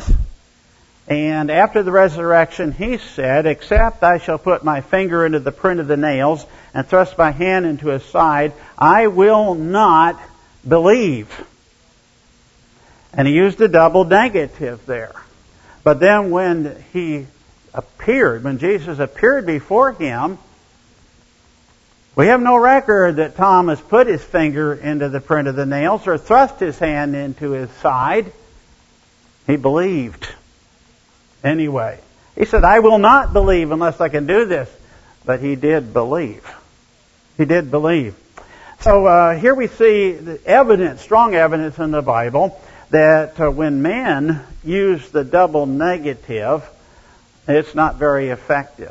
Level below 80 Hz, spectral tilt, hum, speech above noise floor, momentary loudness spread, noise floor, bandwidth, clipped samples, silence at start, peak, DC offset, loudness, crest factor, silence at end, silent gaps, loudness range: -30 dBFS; -7 dB/octave; none; 38 dB; 13 LU; -53 dBFS; 8 kHz; under 0.1%; 0 s; 0 dBFS; under 0.1%; -15 LUFS; 16 dB; 0 s; none; 6 LU